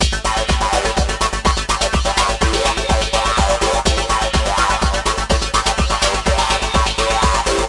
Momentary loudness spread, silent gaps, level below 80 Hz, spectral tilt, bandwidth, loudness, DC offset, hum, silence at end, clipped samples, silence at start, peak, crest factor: 2 LU; none; -22 dBFS; -3 dB/octave; 11.5 kHz; -16 LUFS; under 0.1%; none; 0 s; under 0.1%; 0 s; 0 dBFS; 16 dB